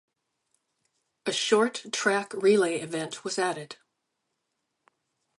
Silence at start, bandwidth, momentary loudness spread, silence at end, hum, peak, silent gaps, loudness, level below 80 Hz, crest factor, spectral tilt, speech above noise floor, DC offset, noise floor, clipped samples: 1.25 s; 11.5 kHz; 13 LU; 1.65 s; none; -8 dBFS; none; -27 LUFS; -82 dBFS; 20 dB; -3 dB/octave; 54 dB; under 0.1%; -81 dBFS; under 0.1%